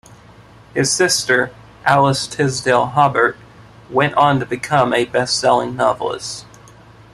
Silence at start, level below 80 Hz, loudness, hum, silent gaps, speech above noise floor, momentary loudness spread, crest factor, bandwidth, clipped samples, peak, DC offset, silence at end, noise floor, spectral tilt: 0.75 s; -52 dBFS; -16 LUFS; none; none; 27 dB; 9 LU; 18 dB; 13.5 kHz; under 0.1%; 0 dBFS; under 0.1%; 0.7 s; -43 dBFS; -3.5 dB/octave